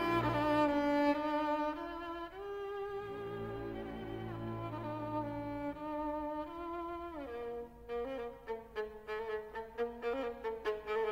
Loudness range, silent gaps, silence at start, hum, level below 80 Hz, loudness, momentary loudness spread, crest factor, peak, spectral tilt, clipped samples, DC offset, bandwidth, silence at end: 7 LU; none; 0 s; none; -58 dBFS; -39 LUFS; 12 LU; 16 dB; -22 dBFS; -7 dB/octave; under 0.1%; under 0.1%; 16 kHz; 0 s